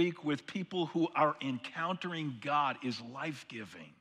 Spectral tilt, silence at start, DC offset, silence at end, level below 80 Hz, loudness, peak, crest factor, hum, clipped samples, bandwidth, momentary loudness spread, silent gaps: -6 dB/octave; 0 s; under 0.1%; 0.1 s; -84 dBFS; -35 LUFS; -16 dBFS; 20 dB; none; under 0.1%; 11.5 kHz; 11 LU; none